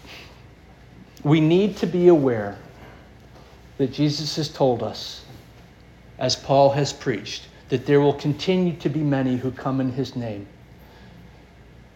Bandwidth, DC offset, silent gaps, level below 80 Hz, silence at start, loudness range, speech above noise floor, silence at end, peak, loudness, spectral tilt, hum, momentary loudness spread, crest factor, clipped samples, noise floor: 14 kHz; under 0.1%; none; -52 dBFS; 0.05 s; 5 LU; 27 dB; 0.7 s; -4 dBFS; -22 LUFS; -6.5 dB/octave; none; 16 LU; 20 dB; under 0.1%; -48 dBFS